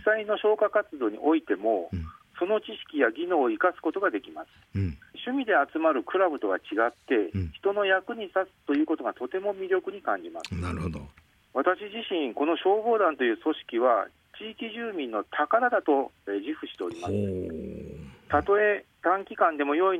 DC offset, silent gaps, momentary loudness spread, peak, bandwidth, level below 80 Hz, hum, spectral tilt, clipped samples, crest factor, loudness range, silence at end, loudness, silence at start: under 0.1%; none; 12 LU; -8 dBFS; 10.5 kHz; -58 dBFS; none; -7 dB/octave; under 0.1%; 20 dB; 3 LU; 0 s; -27 LUFS; 0 s